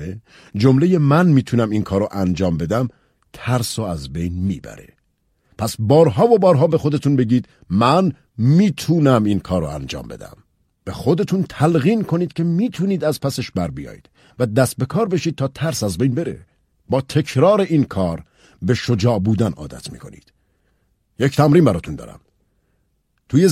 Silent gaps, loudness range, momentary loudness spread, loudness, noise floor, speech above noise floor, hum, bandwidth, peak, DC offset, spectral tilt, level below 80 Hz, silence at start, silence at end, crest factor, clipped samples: none; 6 LU; 17 LU; -18 LUFS; -66 dBFS; 49 dB; none; 15 kHz; -2 dBFS; under 0.1%; -7 dB/octave; -46 dBFS; 0 s; 0 s; 18 dB; under 0.1%